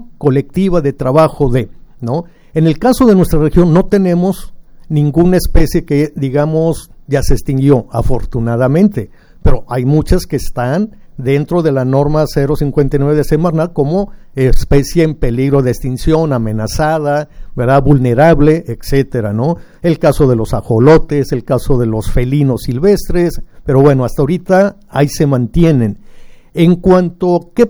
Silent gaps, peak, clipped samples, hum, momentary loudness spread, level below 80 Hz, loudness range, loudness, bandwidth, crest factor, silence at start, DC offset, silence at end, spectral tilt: none; 0 dBFS; 0.2%; none; 8 LU; -22 dBFS; 3 LU; -12 LUFS; over 20 kHz; 12 dB; 0 s; under 0.1%; 0 s; -7.5 dB/octave